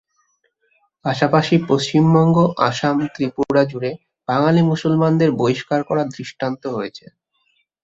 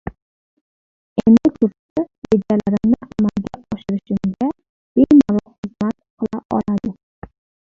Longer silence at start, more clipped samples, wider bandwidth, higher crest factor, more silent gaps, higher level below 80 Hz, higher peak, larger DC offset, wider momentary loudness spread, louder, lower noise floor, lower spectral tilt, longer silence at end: first, 1.05 s vs 0.05 s; neither; first, 8 kHz vs 7.2 kHz; about the same, 16 dB vs 16 dB; second, none vs 0.22-1.16 s, 1.79-1.96 s, 2.18-2.22 s, 4.69-4.95 s, 5.58-5.63 s, 6.10-6.17 s, 6.45-6.49 s; second, -56 dBFS vs -48 dBFS; about the same, -2 dBFS vs -2 dBFS; neither; second, 12 LU vs 16 LU; about the same, -18 LUFS vs -18 LUFS; second, -66 dBFS vs under -90 dBFS; second, -7 dB/octave vs -9 dB/octave; about the same, 0.85 s vs 0.8 s